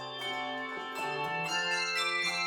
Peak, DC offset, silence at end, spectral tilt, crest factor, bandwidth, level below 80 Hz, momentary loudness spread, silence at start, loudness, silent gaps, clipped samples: -20 dBFS; under 0.1%; 0 s; -1.5 dB/octave; 14 dB; 18 kHz; -74 dBFS; 7 LU; 0 s; -32 LUFS; none; under 0.1%